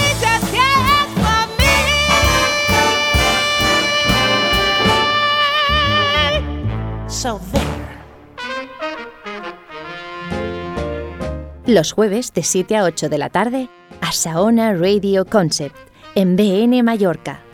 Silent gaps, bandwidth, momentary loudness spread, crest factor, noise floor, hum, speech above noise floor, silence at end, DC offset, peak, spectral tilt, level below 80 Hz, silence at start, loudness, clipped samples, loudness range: none; 19.5 kHz; 14 LU; 16 dB; -37 dBFS; none; 22 dB; 0.15 s; under 0.1%; 0 dBFS; -3.5 dB/octave; -32 dBFS; 0 s; -15 LUFS; under 0.1%; 12 LU